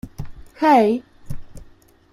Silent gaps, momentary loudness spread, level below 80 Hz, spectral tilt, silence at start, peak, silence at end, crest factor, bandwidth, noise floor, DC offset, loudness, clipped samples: none; 23 LU; -42 dBFS; -6.5 dB/octave; 0.05 s; -2 dBFS; 0.5 s; 18 dB; 14.5 kHz; -49 dBFS; under 0.1%; -17 LUFS; under 0.1%